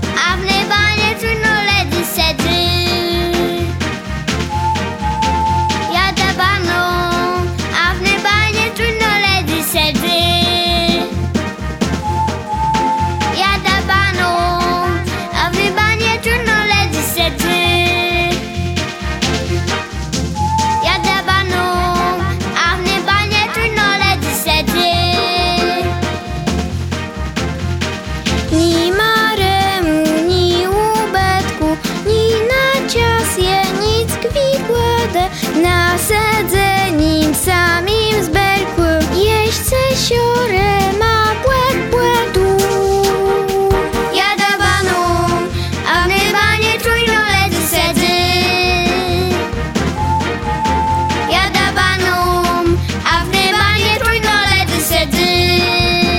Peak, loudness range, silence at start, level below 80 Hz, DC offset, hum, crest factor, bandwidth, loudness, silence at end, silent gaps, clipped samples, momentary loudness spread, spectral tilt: 0 dBFS; 3 LU; 0 s; -28 dBFS; under 0.1%; none; 14 dB; 17.5 kHz; -14 LUFS; 0 s; none; under 0.1%; 6 LU; -4 dB/octave